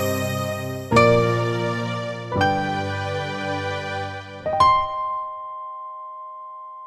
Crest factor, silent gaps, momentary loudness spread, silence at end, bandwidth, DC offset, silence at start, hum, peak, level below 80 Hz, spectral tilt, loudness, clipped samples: 22 dB; none; 18 LU; 0 s; 15 kHz; under 0.1%; 0 s; none; 0 dBFS; -48 dBFS; -5.5 dB/octave; -22 LUFS; under 0.1%